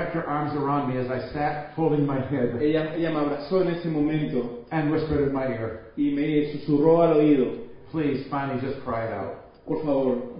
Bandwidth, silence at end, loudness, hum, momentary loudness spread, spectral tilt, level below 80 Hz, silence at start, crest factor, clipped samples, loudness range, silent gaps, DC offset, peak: 5.4 kHz; 0 s; -25 LUFS; none; 10 LU; -12 dB/octave; -50 dBFS; 0 s; 18 dB; under 0.1%; 3 LU; none; under 0.1%; -8 dBFS